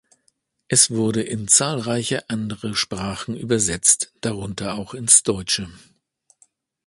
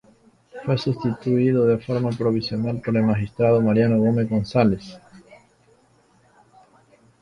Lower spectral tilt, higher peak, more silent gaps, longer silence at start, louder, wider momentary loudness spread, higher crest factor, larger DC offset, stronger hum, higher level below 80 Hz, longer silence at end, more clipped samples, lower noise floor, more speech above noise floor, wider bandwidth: second, -2.5 dB/octave vs -8.5 dB/octave; first, 0 dBFS vs -4 dBFS; neither; first, 0.7 s vs 0.55 s; about the same, -19 LUFS vs -21 LUFS; first, 14 LU vs 7 LU; about the same, 22 dB vs 18 dB; neither; neither; about the same, -50 dBFS vs -52 dBFS; second, 1.1 s vs 2 s; neither; first, -67 dBFS vs -58 dBFS; first, 46 dB vs 38 dB; first, 12 kHz vs 9.2 kHz